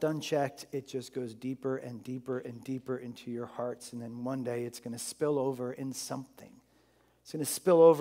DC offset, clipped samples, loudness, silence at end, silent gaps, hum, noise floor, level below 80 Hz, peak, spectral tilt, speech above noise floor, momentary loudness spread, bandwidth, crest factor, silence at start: under 0.1%; under 0.1%; -34 LUFS; 0 s; none; none; -67 dBFS; -78 dBFS; -10 dBFS; -5.5 dB/octave; 35 dB; 10 LU; 16 kHz; 22 dB; 0 s